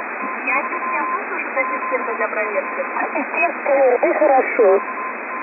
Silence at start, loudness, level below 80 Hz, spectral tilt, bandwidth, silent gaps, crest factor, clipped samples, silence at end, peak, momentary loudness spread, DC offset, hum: 0 s; -19 LUFS; under -90 dBFS; -9 dB/octave; 2.8 kHz; none; 14 dB; under 0.1%; 0 s; -4 dBFS; 8 LU; under 0.1%; none